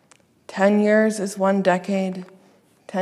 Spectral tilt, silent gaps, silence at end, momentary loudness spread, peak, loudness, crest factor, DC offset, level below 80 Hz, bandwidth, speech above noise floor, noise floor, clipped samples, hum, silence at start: -6 dB/octave; none; 0 s; 14 LU; -4 dBFS; -20 LUFS; 16 dB; under 0.1%; -76 dBFS; 12.5 kHz; 37 dB; -56 dBFS; under 0.1%; none; 0.5 s